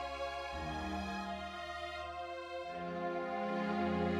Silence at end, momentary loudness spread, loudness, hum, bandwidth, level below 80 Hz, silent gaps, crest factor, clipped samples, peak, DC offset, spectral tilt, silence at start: 0 s; 8 LU; -40 LUFS; none; 12.5 kHz; -56 dBFS; none; 14 dB; under 0.1%; -24 dBFS; under 0.1%; -6 dB/octave; 0 s